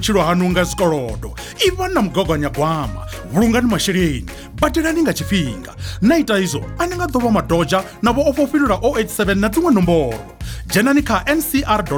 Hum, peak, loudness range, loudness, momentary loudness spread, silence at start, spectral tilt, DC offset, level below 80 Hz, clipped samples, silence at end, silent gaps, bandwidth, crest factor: none; -4 dBFS; 2 LU; -17 LUFS; 11 LU; 0 s; -5 dB/octave; under 0.1%; -32 dBFS; under 0.1%; 0 s; none; over 20 kHz; 14 dB